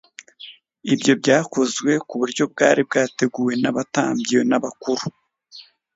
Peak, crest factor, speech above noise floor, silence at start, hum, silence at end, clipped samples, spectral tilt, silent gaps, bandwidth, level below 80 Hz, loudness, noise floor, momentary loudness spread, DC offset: 0 dBFS; 20 dB; 27 dB; 0.4 s; none; 0.35 s; under 0.1%; -4.5 dB/octave; none; 8 kHz; -66 dBFS; -20 LUFS; -46 dBFS; 15 LU; under 0.1%